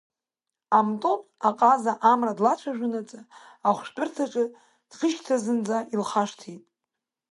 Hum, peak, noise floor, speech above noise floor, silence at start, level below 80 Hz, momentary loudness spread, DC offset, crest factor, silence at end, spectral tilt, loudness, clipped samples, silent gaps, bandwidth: none; -6 dBFS; -88 dBFS; 64 dB; 0.7 s; -80 dBFS; 10 LU; under 0.1%; 20 dB; 0.75 s; -5 dB/octave; -25 LUFS; under 0.1%; none; 11.5 kHz